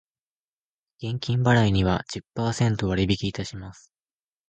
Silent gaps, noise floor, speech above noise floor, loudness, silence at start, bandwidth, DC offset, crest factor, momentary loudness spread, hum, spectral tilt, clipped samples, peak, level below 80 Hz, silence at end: none; under -90 dBFS; over 66 dB; -24 LUFS; 1 s; 9 kHz; under 0.1%; 20 dB; 16 LU; none; -6 dB/octave; under 0.1%; -6 dBFS; -44 dBFS; 0.8 s